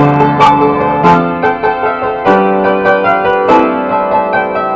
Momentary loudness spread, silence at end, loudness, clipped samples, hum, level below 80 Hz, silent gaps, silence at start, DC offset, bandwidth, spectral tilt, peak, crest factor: 5 LU; 0 s; -10 LUFS; 0.5%; none; -40 dBFS; none; 0 s; under 0.1%; 8 kHz; -7.5 dB/octave; 0 dBFS; 10 dB